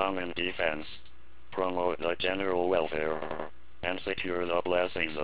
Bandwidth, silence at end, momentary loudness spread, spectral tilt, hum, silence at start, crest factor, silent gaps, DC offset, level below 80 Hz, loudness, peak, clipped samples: 4 kHz; 0 s; 11 LU; -2 dB/octave; none; 0 s; 20 dB; none; 1%; -56 dBFS; -31 LUFS; -12 dBFS; under 0.1%